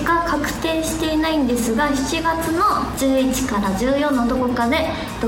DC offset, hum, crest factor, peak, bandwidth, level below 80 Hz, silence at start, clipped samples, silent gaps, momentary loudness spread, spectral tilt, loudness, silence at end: under 0.1%; none; 14 dB; -6 dBFS; 17 kHz; -36 dBFS; 0 s; under 0.1%; none; 3 LU; -4.5 dB/octave; -19 LUFS; 0 s